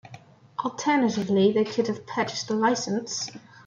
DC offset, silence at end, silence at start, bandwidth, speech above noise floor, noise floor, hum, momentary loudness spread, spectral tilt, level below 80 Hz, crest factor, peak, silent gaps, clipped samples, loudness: under 0.1%; 0.25 s; 0.05 s; 7.6 kHz; 24 dB; -49 dBFS; none; 10 LU; -4.5 dB/octave; -68 dBFS; 16 dB; -10 dBFS; none; under 0.1%; -25 LUFS